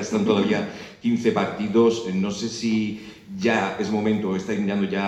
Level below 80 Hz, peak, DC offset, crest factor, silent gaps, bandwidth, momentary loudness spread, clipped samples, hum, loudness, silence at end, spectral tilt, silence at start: -60 dBFS; -4 dBFS; under 0.1%; 18 dB; none; 8.8 kHz; 8 LU; under 0.1%; none; -23 LUFS; 0 s; -5.5 dB/octave; 0 s